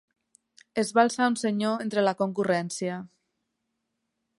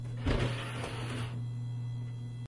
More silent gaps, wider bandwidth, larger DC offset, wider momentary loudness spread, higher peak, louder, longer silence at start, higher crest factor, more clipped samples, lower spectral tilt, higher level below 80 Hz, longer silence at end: neither; about the same, 11.5 kHz vs 11.5 kHz; neither; first, 10 LU vs 7 LU; first, -6 dBFS vs -16 dBFS; first, -26 LUFS vs -37 LUFS; first, 0.75 s vs 0 s; about the same, 22 dB vs 18 dB; neither; about the same, -5 dB/octave vs -6 dB/octave; second, -76 dBFS vs -46 dBFS; first, 1.35 s vs 0 s